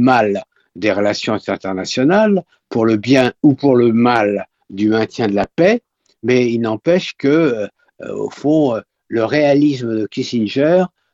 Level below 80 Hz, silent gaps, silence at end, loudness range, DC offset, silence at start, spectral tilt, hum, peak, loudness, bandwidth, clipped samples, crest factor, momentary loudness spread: -54 dBFS; none; 0.25 s; 3 LU; under 0.1%; 0 s; -6.5 dB/octave; none; 0 dBFS; -16 LUFS; 8 kHz; under 0.1%; 16 dB; 11 LU